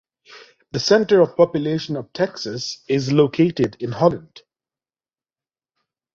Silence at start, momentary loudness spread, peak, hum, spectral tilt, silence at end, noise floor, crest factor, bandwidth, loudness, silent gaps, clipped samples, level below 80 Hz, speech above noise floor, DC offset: 0.3 s; 12 LU; -2 dBFS; none; -6 dB/octave; 1.95 s; under -90 dBFS; 18 dB; 7.6 kHz; -19 LUFS; none; under 0.1%; -58 dBFS; over 71 dB; under 0.1%